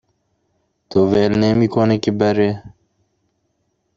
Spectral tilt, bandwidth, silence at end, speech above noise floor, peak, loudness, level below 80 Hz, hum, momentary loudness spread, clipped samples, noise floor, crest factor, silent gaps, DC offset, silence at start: -7.5 dB/octave; 7.6 kHz; 1.3 s; 53 dB; -2 dBFS; -16 LUFS; -50 dBFS; none; 6 LU; under 0.1%; -68 dBFS; 16 dB; none; under 0.1%; 0.9 s